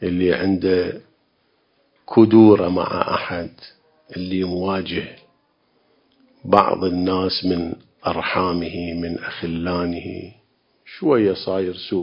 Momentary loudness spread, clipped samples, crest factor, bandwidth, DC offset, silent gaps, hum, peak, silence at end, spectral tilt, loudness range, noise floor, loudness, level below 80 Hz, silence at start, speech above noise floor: 15 LU; under 0.1%; 20 dB; 5.4 kHz; under 0.1%; none; none; 0 dBFS; 0 s; -9.5 dB/octave; 7 LU; -64 dBFS; -20 LUFS; -46 dBFS; 0 s; 45 dB